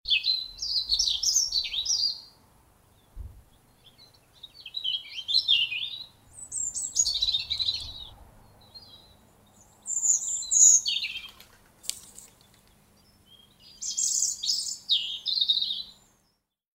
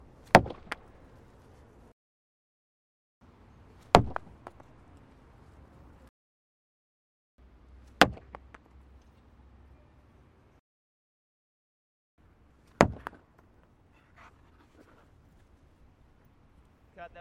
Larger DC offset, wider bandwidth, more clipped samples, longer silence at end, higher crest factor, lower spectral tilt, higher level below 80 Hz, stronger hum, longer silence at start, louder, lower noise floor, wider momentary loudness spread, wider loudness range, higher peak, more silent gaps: neither; about the same, 16 kHz vs 16 kHz; neither; first, 0.85 s vs 0.15 s; second, 24 dB vs 34 dB; second, 3 dB/octave vs -5 dB/octave; about the same, -56 dBFS vs -52 dBFS; neither; second, 0.05 s vs 0.35 s; about the same, -24 LUFS vs -26 LUFS; first, -73 dBFS vs -62 dBFS; second, 18 LU vs 28 LU; first, 9 LU vs 3 LU; second, -6 dBFS vs -2 dBFS; second, none vs 1.93-3.21 s, 6.09-7.38 s, 10.59-12.18 s